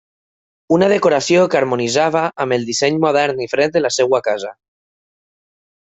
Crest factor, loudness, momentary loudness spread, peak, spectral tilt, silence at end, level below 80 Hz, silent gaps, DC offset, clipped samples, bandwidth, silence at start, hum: 16 dB; -16 LUFS; 5 LU; -2 dBFS; -4.5 dB/octave; 1.45 s; -60 dBFS; none; under 0.1%; under 0.1%; 8.2 kHz; 0.7 s; none